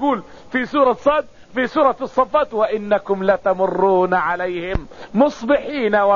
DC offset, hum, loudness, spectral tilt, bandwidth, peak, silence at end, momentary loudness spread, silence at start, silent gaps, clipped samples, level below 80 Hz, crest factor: 0.6%; none; -19 LUFS; -4 dB/octave; 7.2 kHz; -2 dBFS; 0 s; 9 LU; 0 s; none; under 0.1%; -42 dBFS; 16 dB